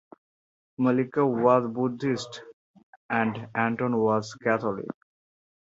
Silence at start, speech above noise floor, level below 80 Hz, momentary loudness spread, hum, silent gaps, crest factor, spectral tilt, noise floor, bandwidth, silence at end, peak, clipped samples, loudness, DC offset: 0.8 s; over 65 dB; -68 dBFS; 14 LU; none; 2.53-2.74 s, 2.83-3.09 s; 20 dB; -7 dB/octave; under -90 dBFS; 7.8 kHz; 0.85 s; -8 dBFS; under 0.1%; -26 LUFS; under 0.1%